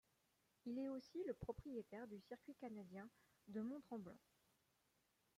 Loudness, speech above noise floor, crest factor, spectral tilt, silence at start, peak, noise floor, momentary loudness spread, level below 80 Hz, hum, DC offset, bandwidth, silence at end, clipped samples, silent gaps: -53 LUFS; 32 dB; 18 dB; -7.5 dB/octave; 0.65 s; -36 dBFS; -84 dBFS; 10 LU; -76 dBFS; none; under 0.1%; 15.5 kHz; 1.2 s; under 0.1%; none